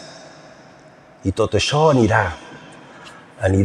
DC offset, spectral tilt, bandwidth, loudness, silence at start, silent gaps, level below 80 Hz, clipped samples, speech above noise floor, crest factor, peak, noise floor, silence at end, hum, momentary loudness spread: under 0.1%; -5.5 dB/octave; 11 kHz; -18 LUFS; 0 s; none; -46 dBFS; under 0.1%; 29 dB; 18 dB; -2 dBFS; -46 dBFS; 0 s; none; 25 LU